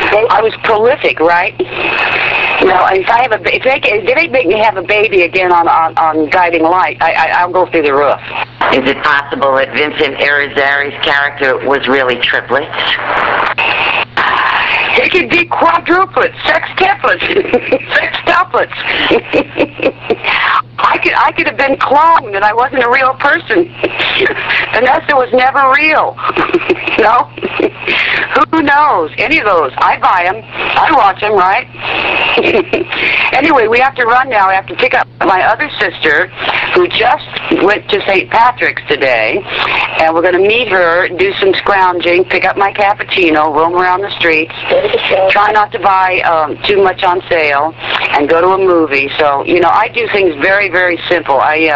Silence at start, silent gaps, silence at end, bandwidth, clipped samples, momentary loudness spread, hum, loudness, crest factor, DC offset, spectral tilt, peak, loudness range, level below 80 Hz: 0 s; none; 0 s; 7.8 kHz; under 0.1%; 4 LU; none; -10 LUFS; 10 dB; under 0.1%; -5.5 dB/octave; 0 dBFS; 1 LU; -42 dBFS